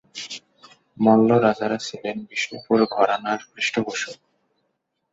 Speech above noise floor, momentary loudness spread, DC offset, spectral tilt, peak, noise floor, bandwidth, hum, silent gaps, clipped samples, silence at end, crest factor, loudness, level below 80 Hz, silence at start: 53 dB; 16 LU; under 0.1%; -5 dB/octave; -4 dBFS; -74 dBFS; 8 kHz; none; none; under 0.1%; 0.95 s; 20 dB; -21 LUFS; -66 dBFS; 0.15 s